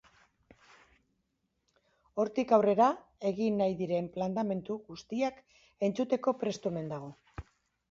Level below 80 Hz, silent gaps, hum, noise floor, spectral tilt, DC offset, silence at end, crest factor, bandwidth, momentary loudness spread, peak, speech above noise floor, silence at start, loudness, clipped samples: -64 dBFS; none; none; -80 dBFS; -7 dB/octave; under 0.1%; 0.5 s; 22 dB; 7.6 kHz; 15 LU; -10 dBFS; 49 dB; 2.15 s; -32 LUFS; under 0.1%